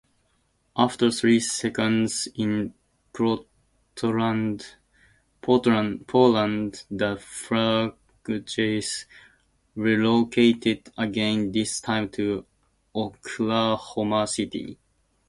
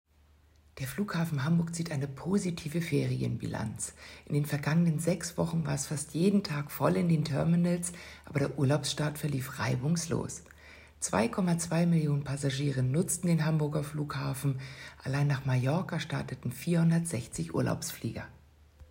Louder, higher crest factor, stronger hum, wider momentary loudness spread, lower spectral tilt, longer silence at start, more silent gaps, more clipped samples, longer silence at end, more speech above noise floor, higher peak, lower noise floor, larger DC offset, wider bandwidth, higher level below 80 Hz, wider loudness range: first, -24 LUFS vs -31 LUFS; first, 22 dB vs 16 dB; neither; first, 13 LU vs 9 LU; second, -4.5 dB/octave vs -6 dB/octave; about the same, 0.75 s vs 0.75 s; neither; neither; first, 0.55 s vs 0.05 s; first, 45 dB vs 32 dB; first, -4 dBFS vs -14 dBFS; first, -68 dBFS vs -63 dBFS; neither; second, 11.5 kHz vs 16 kHz; about the same, -58 dBFS vs -58 dBFS; about the same, 4 LU vs 3 LU